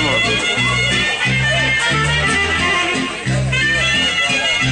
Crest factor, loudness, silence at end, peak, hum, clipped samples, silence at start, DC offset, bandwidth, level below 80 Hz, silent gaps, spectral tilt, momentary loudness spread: 12 dB; -14 LUFS; 0 s; -4 dBFS; none; under 0.1%; 0 s; under 0.1%; 10.5 kHz; -34 dBFS; none; -3 dB/octave; 3 LU